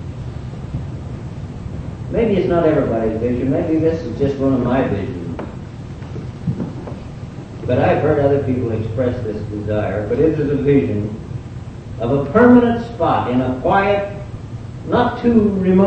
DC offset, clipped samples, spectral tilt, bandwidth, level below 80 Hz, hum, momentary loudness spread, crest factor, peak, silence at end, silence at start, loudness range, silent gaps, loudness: under 0.1%; under 0.1%; -9 dB/octave; 8.4 kHz; -36 dBFS; none; 15 LU; 18 dB; 0 dBFS; 0 s; 0 s; 6 LU; none; -17 LUFS